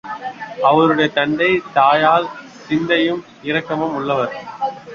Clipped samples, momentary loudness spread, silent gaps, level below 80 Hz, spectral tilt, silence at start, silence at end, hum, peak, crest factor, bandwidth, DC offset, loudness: under 0.1%; 14 LU; none; -56 dBFS; -6 dB/octave; 0.05 s; 0 s; none; -2 dBFS; 16 dB; 7.2 kHz; under 0.1%; -17 LUFS